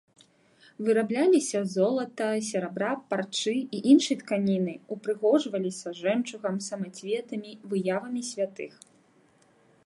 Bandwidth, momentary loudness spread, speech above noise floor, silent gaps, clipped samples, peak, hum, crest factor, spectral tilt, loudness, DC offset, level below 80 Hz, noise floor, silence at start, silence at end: 11.5 kHz; 11 LU; 35 dB; none; under 0.1%; -8 dBFS; none; 20 dB; -5 dB/octave; -28 LUFS; under 0.1%; -78 dBFS; -62 dBFS; 0.8 s; 1.15 s